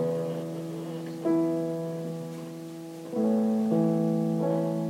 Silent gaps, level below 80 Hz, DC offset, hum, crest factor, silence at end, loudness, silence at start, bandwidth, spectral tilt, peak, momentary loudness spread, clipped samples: none; -78 dBFS; under 0.1%; none; 12 dB; 0 s; -29 LUFS; 0 s; 16 kHz; -8.5 dB/octave; -16 dBFS; 13 LU; under 0.1%